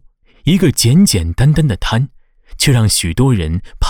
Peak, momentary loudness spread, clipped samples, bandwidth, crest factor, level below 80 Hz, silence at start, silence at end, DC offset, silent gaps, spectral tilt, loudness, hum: -2 dBFS; 8 LU; under 0.1%; 19 kHz; 10 dB; -26 dBFS; 0.45 s; 0 s; under 0.1%; none; -5 dB/octave; -13 LUFS; none